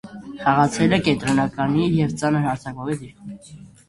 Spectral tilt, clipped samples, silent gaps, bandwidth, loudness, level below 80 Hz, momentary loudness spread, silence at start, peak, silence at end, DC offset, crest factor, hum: -6 dB/octave; under 0.1%; none; 11.5 kHz; -21 LUFS; -48 dBFS; 20 LU; 0.05 s; -2 dBFS; 0.2 s; under 0.1%; 18 dB; none